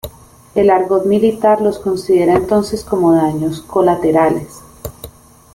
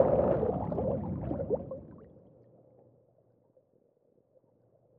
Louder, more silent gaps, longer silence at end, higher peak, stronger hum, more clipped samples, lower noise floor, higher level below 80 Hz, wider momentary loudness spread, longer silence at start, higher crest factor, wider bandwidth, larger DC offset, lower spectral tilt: first, -14 LUFS vs -32 LUFS; neither; second, 0.45 s vs 2.95 s; first, -2 dBFS vs -10 dBFS; neither; neither; second, -39 dBFS vs -69 dBFS; first, -42 dBFS vs -54 dBFS; about the same, 18 LU vs 19 LU; about the same, 0.05 s vs 0 s; second, 14 dB vs 24 dB; first, 17 kHz vs 3.7 kHz; neither; second, -7 dB/octave vs -10.5 dB/octave